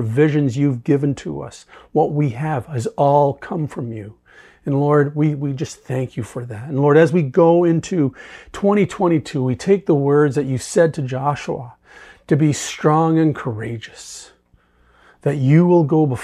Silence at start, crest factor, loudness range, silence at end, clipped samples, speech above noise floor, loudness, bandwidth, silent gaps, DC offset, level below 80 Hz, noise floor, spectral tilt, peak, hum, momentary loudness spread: 0 s; 16 dB; 4 LU; 0 s; under 0.1%; 39 dB; -18 LUFS; 12 kHz; none; under 0.1%; -54 dBFS; -57 dBFS; -7.5 dB/octave; -2 dBFS; none; 15 LU